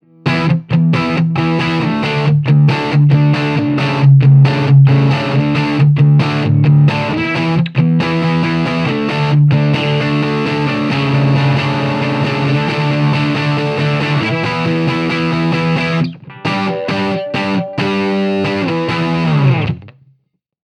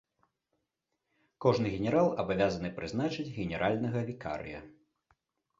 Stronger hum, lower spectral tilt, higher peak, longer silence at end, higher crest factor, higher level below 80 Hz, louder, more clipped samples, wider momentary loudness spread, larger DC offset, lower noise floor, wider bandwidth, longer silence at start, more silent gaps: neither; about the same, -8 dB/octave vs -7 dB/octave; first, 0 dBFS vs -12 dBFS; about the same, 0.75 s vs 0.85 s; second, 12 dB vs 22 dB; first, -48 dBFS vs -58 dBFS; first, -13 LUFS vs -32 LUFS; neither; second, 7 LU vs 11 LU; neither; second, -61 dBFS vs -84 dBFS; second, 6.6 kHz vs 7.8 kHz; second, 0.25 s vs 1.4 s; neither